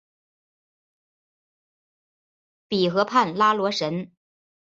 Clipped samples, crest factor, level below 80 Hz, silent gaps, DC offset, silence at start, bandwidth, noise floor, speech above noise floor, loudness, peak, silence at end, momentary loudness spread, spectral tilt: under 0.1%; 22 dB; -72 dBFS; none; under 0.1%; 2.7 s; 7.8 kHz; under -90 dBFS; over 68 dB; -22 LUFS; -6 dBFS; 0.65 s; 10 LU; -5 dB/octave